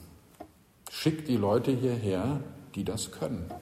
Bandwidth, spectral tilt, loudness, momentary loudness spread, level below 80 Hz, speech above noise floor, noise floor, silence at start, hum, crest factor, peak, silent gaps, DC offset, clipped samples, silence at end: 16 kHz; -6 dB/octave; -31 LUFS; 22 LU; -56 dBFS; 22 dB; -52 dBFS; 0 s; none; 18 dB; -12 dBFS; none; under 0.1%; under 0.1%; 0 s